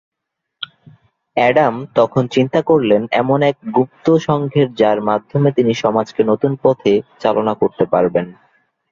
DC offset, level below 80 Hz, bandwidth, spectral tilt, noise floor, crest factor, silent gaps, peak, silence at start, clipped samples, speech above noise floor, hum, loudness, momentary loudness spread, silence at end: under 0.1%; -56 dBFS; 7.4 kHz; -7.5 dB/octave; -78 dBFS; 14 dB; none; -2 dBFS; 0.6 s; under 0.1%; 63 dB; none; -16 LUFS; 4 LU; 0.6 s